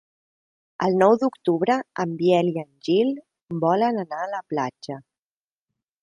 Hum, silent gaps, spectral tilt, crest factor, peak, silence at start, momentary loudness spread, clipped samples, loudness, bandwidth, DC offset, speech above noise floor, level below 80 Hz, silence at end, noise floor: none; 3.42-3.46 s; -7 dB/octave; 20 dB; -4 dBFS; 0.8 s; 14 LU; under 0.1%; -23 LUFS; 11 kHz; under 0.1%; over 68 dB; -70 dBFS; 1.05 s; under -90 dBFS